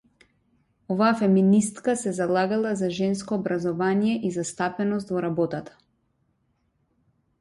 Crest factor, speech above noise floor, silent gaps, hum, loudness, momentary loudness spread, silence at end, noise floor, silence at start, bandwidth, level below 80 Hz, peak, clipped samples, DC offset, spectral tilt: 16 dB; 47 dB; none; none; -24 LUFS; 8 LU; 1.75 s; -70 dBFS; 0.9 s; 11.5 kHz; -64 dBFS; -10 dBFS; under 0.1%; under 0.1%; -6 dB/octave